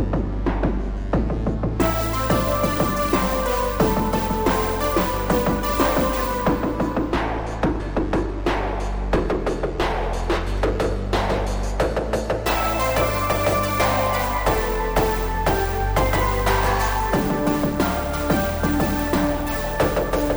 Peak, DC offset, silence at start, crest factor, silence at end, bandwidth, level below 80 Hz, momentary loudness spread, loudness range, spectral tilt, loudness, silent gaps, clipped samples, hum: -6 dBFS; under 0.1%; 0 s; 16 dB; 0 s; over 20 kHz; -28 dBFS; 4 LU; 3 LU; -5.5 dB/octave; -22 LUFS; none; under 0.1%; none